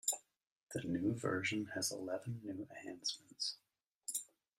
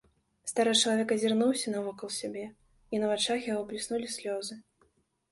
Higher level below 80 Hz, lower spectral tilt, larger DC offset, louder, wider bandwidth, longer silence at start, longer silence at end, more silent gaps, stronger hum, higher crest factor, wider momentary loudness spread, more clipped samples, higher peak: second, -78 dBFS vs -70 dBFS; about the same, -3 dB/octave vs -3 dB/octave; neither; second, -41 LUFS vs -30 LUFS; first, 15.5 kHz vs 11.5 kHz; second, 0.05 s vs 0.45 s; second, 0.35 s vs 0.7 s; first, 0.52-0.67 s, 3.95-4.01 s vs none; neither; about the same, 22 dB vs 20 dB; second, 10 LU vs 15 LU; neither; second, -22 dBFS vs -12 dBFS